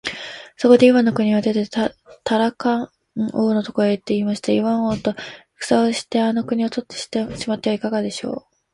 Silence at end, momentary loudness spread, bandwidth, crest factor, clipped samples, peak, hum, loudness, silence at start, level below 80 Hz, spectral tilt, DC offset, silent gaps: 0.35 s; 14 LU; 11.5 kHz; 18 dB; under 0.1%; 0 dBFS; none; -20 LUFS; 0.05 s; -56 dBFS; -5.5 dB/octave; under 0.1%; none